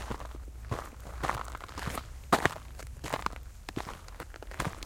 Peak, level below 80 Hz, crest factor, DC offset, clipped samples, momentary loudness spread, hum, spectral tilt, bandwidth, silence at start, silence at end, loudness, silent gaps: -4 dBFS; -44 dBFS; 32 dB; under 0.1%; under 0.1%; 17 LU; none; -4.5 dB/octave; 17 kHz; 0 s; 0 s; -36 LUFS; none